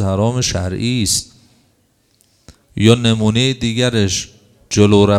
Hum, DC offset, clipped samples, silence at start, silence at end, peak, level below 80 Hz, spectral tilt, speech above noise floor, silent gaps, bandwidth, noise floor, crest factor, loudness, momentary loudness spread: none; under 0.1%; under 0.1%; 0 s; 0 s; 0 dBFS; -42 dBFS; -5 dB/octave; 45 dB; none; 15 kHz; -59 dBFS; 16 dB; -15 LUFS; 8 LU